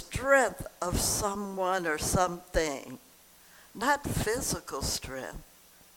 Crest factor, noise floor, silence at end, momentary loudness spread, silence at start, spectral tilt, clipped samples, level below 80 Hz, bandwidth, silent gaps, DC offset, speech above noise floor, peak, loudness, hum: 22 dB; -57 dBFS; 0.55 s; 16 LU; 0 s; -3.5 dB/octave; under 0.1%; -44 dBFS; 19 kHz; none; under 0.1%; 27 dB; -10 dBFS; -30 LUFS; none